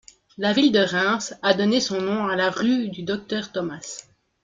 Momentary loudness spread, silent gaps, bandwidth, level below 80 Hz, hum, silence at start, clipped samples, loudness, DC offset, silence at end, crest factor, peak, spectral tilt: 11 LU; none; 9.2 kHz; -64 dBFS; none; 0.4 s; under 0.1%; -22 LUFS; under 0.1%; 0.4 s; 18 dB; -4 dBFS; -4 dB/octave